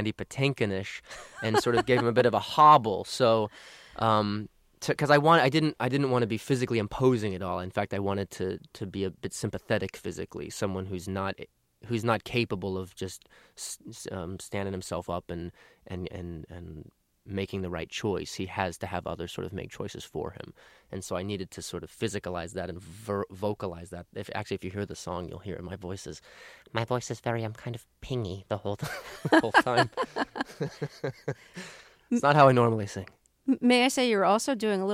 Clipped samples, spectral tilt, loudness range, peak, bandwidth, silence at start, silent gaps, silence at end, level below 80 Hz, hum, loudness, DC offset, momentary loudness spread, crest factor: under 0.1%; -5.5 dB/octave; 12 LU; -6 dBFS; 16 kHz; 0 s; none; 0 s; -58 dBFS; none; -28 LUFS; under 0.1%; 18 LU; 22 dB